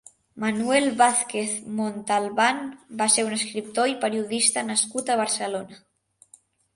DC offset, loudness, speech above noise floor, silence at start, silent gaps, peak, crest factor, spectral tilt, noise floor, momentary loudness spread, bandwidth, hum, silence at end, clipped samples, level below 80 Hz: under 0.1%; -23 LUFS; 33 dB; 0.35 s; none; -6 dBFS; 20 dB; -2 dB/octave; -57 dBFS; 9 LU; 11.5 kHz; none; 0.95 s; under 0.1%; -70 dBFS